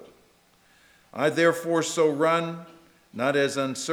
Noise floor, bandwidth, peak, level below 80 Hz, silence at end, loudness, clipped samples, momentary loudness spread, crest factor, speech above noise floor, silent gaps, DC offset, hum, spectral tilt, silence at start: -61 dBFS; 17.5 kHz; -8 dBFS; -74 dBFS; 0 s; -24 LUFS; under 0.1%; 16 LU; 18 dB; 37 dB; none; under 0.1%; none; -4 dB/octave; 0 s